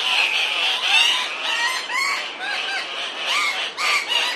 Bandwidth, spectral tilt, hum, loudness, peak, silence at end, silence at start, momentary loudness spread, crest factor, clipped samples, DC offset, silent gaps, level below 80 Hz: 14 kHz; 2.5 dB/octave; none; -19 LUFS; -4 dBFS; 0 s; 0 s; 9 LU; 18 dB; under 0.1%; under 0.1%; none; -80 dBFS